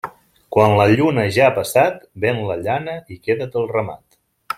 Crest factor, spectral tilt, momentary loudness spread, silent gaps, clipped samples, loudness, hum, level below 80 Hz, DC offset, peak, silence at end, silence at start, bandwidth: 16 dB; -6 dB/octave; 11 LU; none; under 0.1%; -18 LUFS; none; -54 dBFS; under 0.1%; -2 dBFS; 0.05 s; 0.05 s; 16.5 kHz